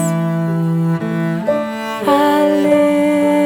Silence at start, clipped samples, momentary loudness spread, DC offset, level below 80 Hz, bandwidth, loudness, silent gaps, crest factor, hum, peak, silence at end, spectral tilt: 0 s; under 0.1%; 6 LU; under 0.1%; -62 dBFS; 18.5 kHz; -15 LUFS; none; 12 dB; none; -2 dBFS; 0 s; -7 dB/octave